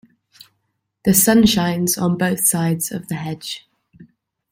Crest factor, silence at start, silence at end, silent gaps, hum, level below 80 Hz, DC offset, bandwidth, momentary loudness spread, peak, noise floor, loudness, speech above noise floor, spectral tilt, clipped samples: 20 dB; 1.05 s; 0.45 s; none; none; -46 dBFS; under 0.1%; 16.5 kHz; 15 LU; 0 dBFS; -72 dBFS; -17 LUFS; 55 dB; -4 dB/octave; under 0.1%